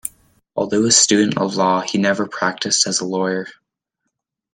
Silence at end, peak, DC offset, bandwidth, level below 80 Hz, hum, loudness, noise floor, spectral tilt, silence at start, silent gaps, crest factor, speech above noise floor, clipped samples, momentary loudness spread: 1 s; 0 dBFS; under 0.1%; 16.5 kHz; -62 dBFS; none; -17 LUFS; -77 dBFS; -2.5 dB/octave; 0.05 s; none; 20 dB; 59 dB; under 0.1%; 14 LU